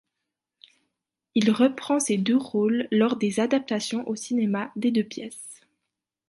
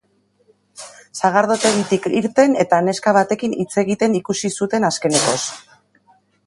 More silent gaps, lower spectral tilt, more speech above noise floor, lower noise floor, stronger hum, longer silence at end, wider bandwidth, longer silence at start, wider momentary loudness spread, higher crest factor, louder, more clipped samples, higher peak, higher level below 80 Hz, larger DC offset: neither; about the same, -5 dB/octave vs -4 dB/octave; first, 60 dB vs 43 dB; first, -84 dBFS vs -60 dBFS; neither; about the same, 0.75 s vs 0.85 s; about the same, 11.5 kHz vs 11.5 kHz; first, 1.35 s vs 0.8 s; about the same, 10 LU vs 12 LU; about the same, 18 dB vs 18 dB; second, -24 LUFS vs -17 LUFS; neither; second, -8 dBFS vs 0 dBFS; second, -74 dBFS vs -62 dBFS; neither